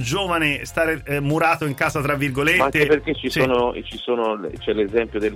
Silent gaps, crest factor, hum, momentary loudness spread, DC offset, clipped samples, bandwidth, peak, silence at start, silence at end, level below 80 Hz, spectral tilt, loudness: none; 14 dB; none; 7 LU; under 0.1%; under 0.1%; 16.5 kHz; -6 dBFS; 0 s; 0 s; -42 dBFS; -5 dB/octave; -20 LUFS